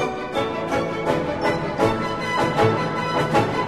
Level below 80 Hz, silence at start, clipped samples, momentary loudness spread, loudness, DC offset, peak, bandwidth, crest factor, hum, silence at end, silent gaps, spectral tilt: -46 dBFS; 0 s; under 0.1%; 5 LU; -22 LUFS; 0.3%; -4 dBFS; 13 kHz; 18 dB; none; 0 s; none; -6 dB/octave